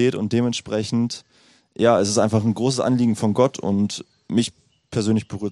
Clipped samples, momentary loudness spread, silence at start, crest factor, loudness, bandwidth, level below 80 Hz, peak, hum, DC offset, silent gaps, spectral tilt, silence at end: under 0.1%; 9 LU; 0 s; 18 dB; -21 LUFS; 11.5 kHz; -60 dBFS; -2 dBFS; none; under 0.1%; none; -5.5 dB/octave; 0 s